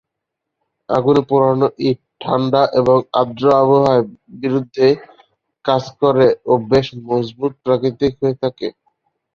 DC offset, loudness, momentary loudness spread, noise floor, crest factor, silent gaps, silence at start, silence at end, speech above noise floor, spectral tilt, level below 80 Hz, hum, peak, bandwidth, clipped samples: under 0.1%; -16 LUFS; 10 LU; -79 dBFS; 14 dB; none; 0.9 s; 0.65 s; 64 dB; -8 dB/octave; -52 dBFS; none; -2 dBFS; 7 kHz; under 0.1%